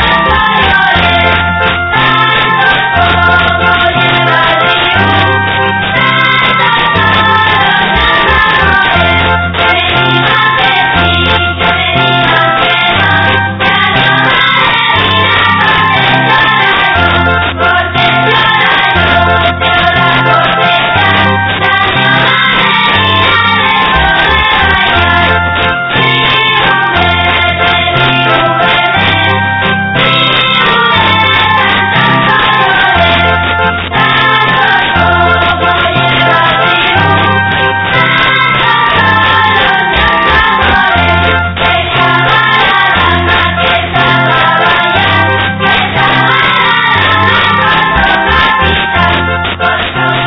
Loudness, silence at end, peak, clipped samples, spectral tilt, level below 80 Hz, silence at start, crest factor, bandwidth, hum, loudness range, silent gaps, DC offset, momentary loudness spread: -7 LUFS; 0 s; 0 dBFS; 1%; -6.5 dB/octave; -28 dBFS; 0 s; 8 dB; 5.4 kHz; none; 1 LU; none; under 0.1%; 3 LU